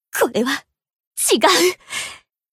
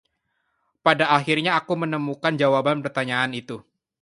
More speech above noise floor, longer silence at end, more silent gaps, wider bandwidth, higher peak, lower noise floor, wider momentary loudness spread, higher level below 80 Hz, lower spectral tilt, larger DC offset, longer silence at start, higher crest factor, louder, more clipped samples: second, 20 dB vs 52 dB; about the same, 0.35 s vs 0.4 s; first, 1.07-1.11 s vs none; first, 16 kHz vs 11.5 kHz; about the same, 0 dBFS vs -2 dBFS; second, -37 dBFS vs -73 dBFS; first, 14 LU vs 7 LU; first, -62 dBFS vs -68 dBFS; second, -1.5 dB/octave vs -5.5 dB/octave; neither; second, 0.15 s vs 0.85 s; about the same, 20 dB vs 22 dB; first, -18 LUFS vs -22 LUFS; neither